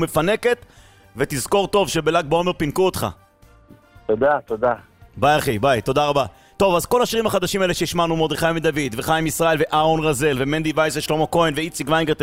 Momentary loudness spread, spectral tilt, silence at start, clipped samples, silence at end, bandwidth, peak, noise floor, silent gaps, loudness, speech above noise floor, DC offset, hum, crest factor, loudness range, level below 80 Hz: 6 LU; -4.5 dB/octave; 0 s; under 0.1%; 0 s; 16 kHz; -4 dBFS; -51 dBFS; none; -20 LUFS; 31 dB; under 0.1%; none; 16 dB; 2 LU; -42 dBFS